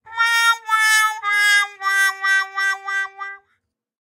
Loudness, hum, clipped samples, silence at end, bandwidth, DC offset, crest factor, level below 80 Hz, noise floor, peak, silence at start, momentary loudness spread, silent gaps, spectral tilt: -17 LUFS; none; under 0.1%; 0.65 s; 16 kHz; under 0.1%; 16 dB; -84 dBFS; -70 dBFS; -4 dBFS; 0.05 s; 9 LU; none; 4.5 dB/octave